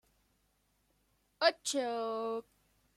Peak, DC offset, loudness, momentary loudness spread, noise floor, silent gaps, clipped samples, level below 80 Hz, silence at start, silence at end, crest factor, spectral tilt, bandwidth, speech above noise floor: -14 dBFS; under 0.1%; -34 LUFS; 9 LU; -76 dBFS; none; under 0.1%; -78 dBFS; 1.4 s; 0.55 s; 24 dB; -1 dB/octave; 14 kHz; 40 dB